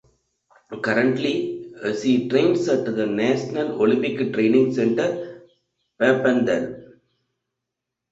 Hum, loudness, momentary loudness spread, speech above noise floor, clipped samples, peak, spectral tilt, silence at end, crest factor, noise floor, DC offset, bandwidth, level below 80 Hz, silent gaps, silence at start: none; -21 LUFS; 11 LU; 63 dB; under 0.1%; -4 dBFS; -6 dB/octave; 1.25 s; 18 dB; -83 dBFS; under 0.1%; 8 kHz; -62 dBFS; none; 0.7 s